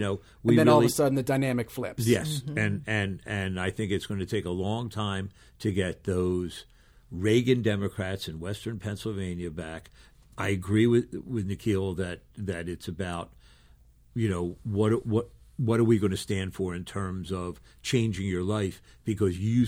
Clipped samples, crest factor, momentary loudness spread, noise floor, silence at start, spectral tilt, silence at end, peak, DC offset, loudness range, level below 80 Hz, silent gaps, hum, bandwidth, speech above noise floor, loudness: under 0.1%; 20 dB; 12 LU; -57 dBFS; 0 s; -6 dB/octave; 0 s; -8 dBFS; under 0.1%; 4 LU; -54 dBFS; none; none; 16 kHz; 29 dB; -28 LUFS